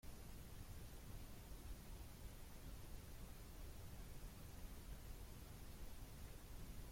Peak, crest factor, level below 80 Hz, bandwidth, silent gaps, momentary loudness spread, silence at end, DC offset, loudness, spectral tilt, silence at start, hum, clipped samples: -42 dBFS; 12 dB; -58 dBFS; 16.5 kHz; none; 1 LU; 0 s; under 0.1%; -58 LUFS; -4.5 dB/octave; 0.05 s; none; under 0.1%